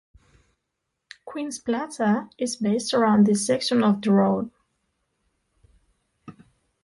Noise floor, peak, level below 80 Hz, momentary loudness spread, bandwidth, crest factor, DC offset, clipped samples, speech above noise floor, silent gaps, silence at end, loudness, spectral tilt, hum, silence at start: -80 dBFS; -8 dBFS; -64 dBFS; 14 LU; 11.5 kHz; 16 dB; under 0.1%; under 0.1%; 58 dB; none; 0.5 s; -23 LUFS; -5.5 dB/octave; none; 1.25 s